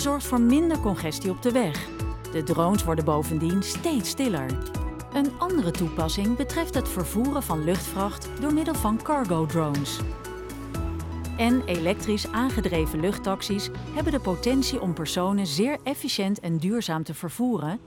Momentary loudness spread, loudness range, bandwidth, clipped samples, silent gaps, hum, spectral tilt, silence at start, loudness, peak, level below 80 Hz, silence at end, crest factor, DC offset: 8 LU; 2 LU; 18 kHz; under 0.1%; none; none; -5.5 dB/octave; 0 s; -26 LUFS; -8 dBFS; -38 dBFS; 0 s; 18 dB; under 0.1%